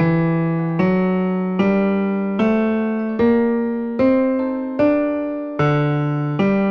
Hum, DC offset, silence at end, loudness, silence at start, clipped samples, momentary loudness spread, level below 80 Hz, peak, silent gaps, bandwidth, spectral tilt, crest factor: none; under 0.1%; 0 s; -19 LUFS; 0 s; under 0.1%; 5 LU; -50 dBFS; -6 dBFS; none; 6.2 kHz; -10 dB/octave; 12 dB